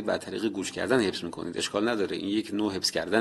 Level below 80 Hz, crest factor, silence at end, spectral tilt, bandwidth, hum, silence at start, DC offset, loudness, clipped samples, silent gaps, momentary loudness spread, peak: -60 dBFS; 20 dB; 0 s; -4 dB/octave; 12.5 kHz; none; 0 s; under 0.1%; -29 LUFS; under 0.1%; none; 6 LU; -8 dBFS